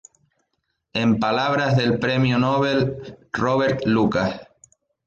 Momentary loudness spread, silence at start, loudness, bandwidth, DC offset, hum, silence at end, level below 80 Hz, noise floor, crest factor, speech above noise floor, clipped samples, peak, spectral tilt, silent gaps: 8 LU; 0.95 s; -21 LUFS; 7.4 kHz; under 0.1%; none; 0.6 s; -52 dBFS; -75 dBFS; 14 dB; 55 dB; under 0.1%; -8 dBFS; -7 dB/octave; none